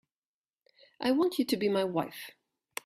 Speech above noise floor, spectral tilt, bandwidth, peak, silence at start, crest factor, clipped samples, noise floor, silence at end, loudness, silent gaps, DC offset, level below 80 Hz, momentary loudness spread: over 61 dB; -5 dB/octave; 16 kHz; -16 dBFS; 1 s; 18 dB; under 0.1%; under -90 dBFS; 0.55 s; -30 LUFS; none; under 0.1%; -74 dBFS; 16 LU